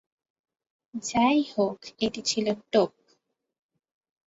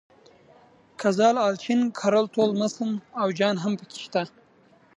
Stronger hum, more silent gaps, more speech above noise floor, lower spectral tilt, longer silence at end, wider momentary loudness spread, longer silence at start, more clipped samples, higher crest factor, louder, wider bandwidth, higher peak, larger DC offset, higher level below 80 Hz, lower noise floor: neither; neither; first, 45 dB vs 34 dB; second, -4 dB/octave vs -5.5 dB/octave; first, 1.45 s vs 0.7 s; about the same, 8 LU vs 9 LU; about the same, 0.95 s vs 1 s; neither; about the same, 20 dB vs 18 dB; about the same, -26 LUFS vs -24 LUFS; second, 8 kHz vs 10.5 kHz; about the same, -10 dBFS vs -8 dBFS; neither; first, -64 dBFS vs -76 dBFS; first, -70 dBFS vs -58 dBFS